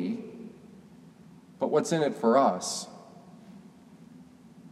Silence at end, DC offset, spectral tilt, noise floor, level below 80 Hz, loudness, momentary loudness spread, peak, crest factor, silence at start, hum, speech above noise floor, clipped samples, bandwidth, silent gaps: 0.05 s; under 0.1%; -4.5 dB/octave; -53 dBFS; -76 dBFS; -27 LUFS; 27 LU; -10 dBFS; 22 dB; 0 s; none; 27 dB; under 0.1%; 13.5 kHz; none